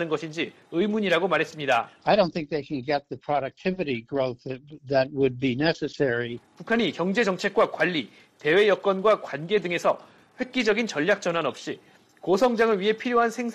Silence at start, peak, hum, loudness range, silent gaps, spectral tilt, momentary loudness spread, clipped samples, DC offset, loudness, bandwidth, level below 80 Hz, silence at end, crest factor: 0 s; -8 dBFS; none; 3 LU; none; -5.5 dB/octave; 9 LU; under 0.1%; under 0.1%; -25 LUFS; 13 kHz; -62 dBFS; 0 s; 18 dB